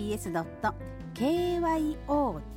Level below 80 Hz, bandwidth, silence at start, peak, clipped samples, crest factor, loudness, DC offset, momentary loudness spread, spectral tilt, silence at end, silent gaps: -46 dBFS; 17 kHz; 0 s; -16 dBFS; under 0.1%; 14 dB; -30 LUFS; under 0.1%; 6 LU; -6 dB/octave; 0 s; none